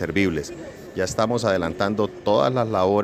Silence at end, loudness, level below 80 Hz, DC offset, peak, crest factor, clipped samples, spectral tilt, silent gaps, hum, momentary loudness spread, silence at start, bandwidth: 0 s; -22 LUFS; -52 dBFS; under 0.1%; -4 dBFS; 18 dB; under 0.1%; -5.5 dB/octave; none; none; 11 LU; 0 s; 16 kHz